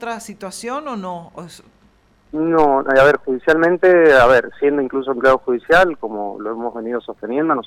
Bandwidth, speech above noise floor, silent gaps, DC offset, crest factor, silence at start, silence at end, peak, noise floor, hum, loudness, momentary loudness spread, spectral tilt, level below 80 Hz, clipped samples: 14.5 kHz; 38 dB; none; under 0.1%; 14 dB; 0 s; 0.05 s; -4 dBFS; -54 dBFS; none; -16 LUFS; 17 LU; -5.5 dB/octave; -44 dBFS; under 0.1%